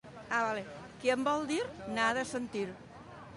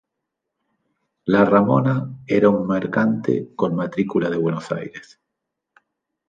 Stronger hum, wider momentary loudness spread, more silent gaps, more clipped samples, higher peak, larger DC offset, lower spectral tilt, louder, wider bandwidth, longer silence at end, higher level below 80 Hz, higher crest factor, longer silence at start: neither; first, 16 LU vs 13 LU; neither; neither; second, -16 dBFS vs -2 dBFS; neither; second, -4 dB/octave vs -8.5 dB/octave; second, -34 LUFS vs -20 LUFS; first, 11.5 kHz vs 7.6 kHz; second, 0 s vs 1.3 s; second, -66 dBFS vs -60 dBFS; about the same, 18 dB vs 18 dB; second, 0.05 s vs 1.25 s